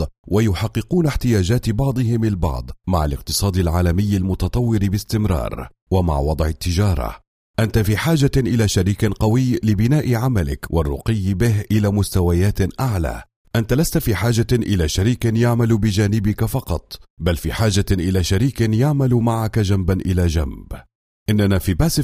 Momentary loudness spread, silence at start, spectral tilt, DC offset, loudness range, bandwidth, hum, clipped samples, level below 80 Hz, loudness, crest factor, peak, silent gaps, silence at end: 7 LU; 0 s; -6.5 dB/octave; under 0.1%; 2 LU; 16 kHz; none; under 0.1%; -30 dBFS; -19 LUFS; 14 dB; -4 dBFS; 0.18-0.24 s, 5.82-5.87 s, 7.27-7.54 s, 13.36-13.45 s, 17.10-17.17 s, 20.95-21.26 s; 0 s